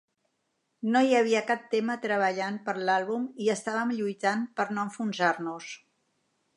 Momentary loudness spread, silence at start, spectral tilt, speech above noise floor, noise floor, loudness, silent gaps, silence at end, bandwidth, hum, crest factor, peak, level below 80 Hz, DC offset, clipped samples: 10 LU; 0.8 s; -4.5 dB/octave; 50 dB; -77 dBFS; -28 LUFS; none; 0.8 s; 11 kHz; none; 18 dB; -10 dBFS; -84 dBFS; under 0.1%; under 0.1%